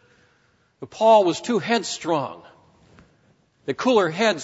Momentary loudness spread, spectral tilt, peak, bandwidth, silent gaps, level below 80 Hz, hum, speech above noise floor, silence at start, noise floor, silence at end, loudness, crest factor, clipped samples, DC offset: 19 LU; -4 dB/octave; -6 dBFS; 8 kHz; none; -68 dBFS; none; 42 dB; 0.8 s; -63 dBFS; 0 s; -20 LUFS; 18 dB; under 0.1%; under 0.1%